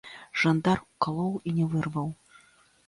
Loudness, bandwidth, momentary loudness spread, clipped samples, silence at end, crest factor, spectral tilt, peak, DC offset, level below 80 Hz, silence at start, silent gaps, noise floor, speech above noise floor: -28 LUFS; 11.5 kHz; 10 LU; under 0.1%; 0.75 s; 18 dB; -7 dB/octave; -10 dBFS; under 0.1%; -60 dBFS; 0.05 s; none; -61 dBFS; 34 dB